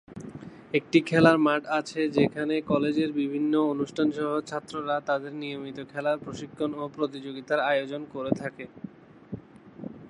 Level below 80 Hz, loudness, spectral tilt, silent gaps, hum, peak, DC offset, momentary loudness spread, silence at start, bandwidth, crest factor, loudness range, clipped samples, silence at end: -64 dBFS; -27 LUFS; -6.5 dB/octave; none; none; -4 dBFS; under 0.1%; 19 LU; 0.1 s; 11 kHz; 24 dB; 7 LU; under 0.1%; 0 s